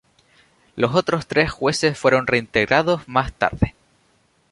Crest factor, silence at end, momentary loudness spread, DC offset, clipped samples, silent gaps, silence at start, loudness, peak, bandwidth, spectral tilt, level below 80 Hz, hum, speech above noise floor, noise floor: 20 dB; 0.8 s; 6 LU; under 0.1%; under 0.1%; none; 0.75 s; -20 LUFS; 0 dBFS; 11.5 kHz; -5 dB/octave; -42 dBFS; none; 42 dB; -61 dBFS